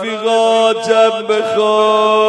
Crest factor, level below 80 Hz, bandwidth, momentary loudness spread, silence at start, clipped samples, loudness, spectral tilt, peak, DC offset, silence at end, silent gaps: 12 dB; -68 dBFS; 10 kHz; 4 LU; 0 s; under 0.1%; -12 LUFS; -3 dB/octave; 0 dBFS; under 0.1%; 0 s; none